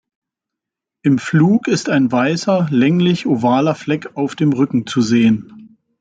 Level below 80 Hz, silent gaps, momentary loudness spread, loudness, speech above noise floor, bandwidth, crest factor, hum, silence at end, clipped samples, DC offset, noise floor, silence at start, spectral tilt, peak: -58 dBFS; none; 7 LU; -16 LUFS; 68 dB; 9 kHz; 14 dB; none; 0.35 s; under 0.1%; under 0.1%; -83 dBFS; 1.05 s; -6.5 dB/octave; -2 dBFS